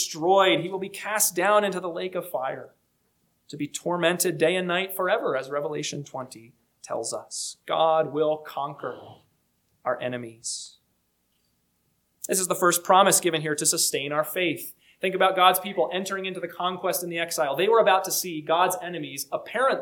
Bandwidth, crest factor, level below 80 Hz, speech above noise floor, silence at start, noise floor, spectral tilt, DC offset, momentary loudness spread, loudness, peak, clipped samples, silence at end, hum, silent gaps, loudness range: 19 kHz; 22 dB; -74 dBFS; 46 dB; 0 s; -71 dBFS; -2.5 dB/octave; under 0.1%; 14 LU; -24 LUFS; -4 dBFS; under 0.1%; 0 s; none; none; 8 LU